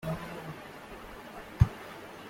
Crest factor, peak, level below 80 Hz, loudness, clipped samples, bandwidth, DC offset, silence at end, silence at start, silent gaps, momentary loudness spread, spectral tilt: 26 dB; -8 dBFS; -42 dBFS; -33 LUFS; under 0.1%; 16.5 kHz; under 0.1%; 0 s; 0 s; none; 17 LU; -7 dB/octave